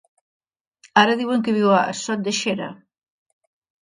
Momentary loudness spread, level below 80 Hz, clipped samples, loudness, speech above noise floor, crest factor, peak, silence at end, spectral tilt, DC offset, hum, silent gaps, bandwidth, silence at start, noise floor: 8 LU; -68 dBFS; under 0.1%; -20 LUFS; 37 dB; 22 dB; 0 dBFS; 1.05 s; -4 dB/octave; under 0.1%; none; none; 10.5 kHz; 0.95 s; -56 dBFS